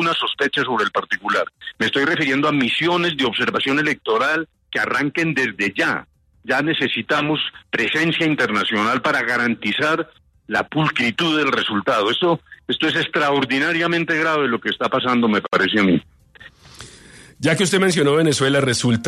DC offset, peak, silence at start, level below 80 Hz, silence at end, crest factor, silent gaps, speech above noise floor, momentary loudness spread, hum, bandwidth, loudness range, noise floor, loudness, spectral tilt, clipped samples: under 0.1%; -4 dBFS; 0 s; -60 dBFS; 0 s; 16 dB; none; 27 dB; 6 LU; none; 13.5 kHz; 2 LU; -46 dBFS; -19 LUFS; -4.5 dB/octave; under 0.1%